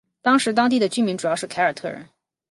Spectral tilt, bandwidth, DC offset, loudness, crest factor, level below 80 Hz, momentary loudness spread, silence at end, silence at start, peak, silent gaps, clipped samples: -4 dB/octave; 11.5 kHz; under 0.1%; -20 LUFS; 16 dB; -70 dBFS; 14 LU; 0.45 s; 0.25 s; -4 dBFS; none; under 0.1%